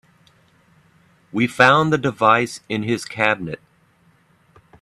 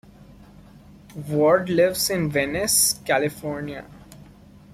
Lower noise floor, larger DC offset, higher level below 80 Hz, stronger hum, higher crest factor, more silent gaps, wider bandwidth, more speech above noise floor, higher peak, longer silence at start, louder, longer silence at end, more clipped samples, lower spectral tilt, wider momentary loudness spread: first, -58 dBFS vs -48 dBFS; neither; second, -58 dBFS vs -52 dBFS; neither; about the same, 22 dB vs 18 dB; neither; second, 13 kHz vs 16 kHz; first, 39 dB vs 26 dB; first, 0 dBFS vs -6 dBFS; first, 1.35 s vs 0.2 s; first, -18 LUFS vs -21 LUFS; first, 1.25 s vs 0.5 s; neither; first, -5 dB/octave vs -3.5 dB/octave; second, 14 LU vs 17 LU